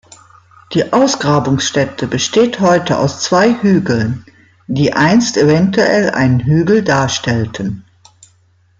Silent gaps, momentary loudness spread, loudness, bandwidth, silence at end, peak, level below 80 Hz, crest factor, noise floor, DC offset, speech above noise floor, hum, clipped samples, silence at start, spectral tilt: none; 8 LU; -13 LUFS; 9.2 kHz; 1 s; 0 dBFS; -48 dBFS; 12 dB; -53 dBFS; under 0.1%; 40 dB; none; under 0.1%; 0.7 s; -5 dB/octave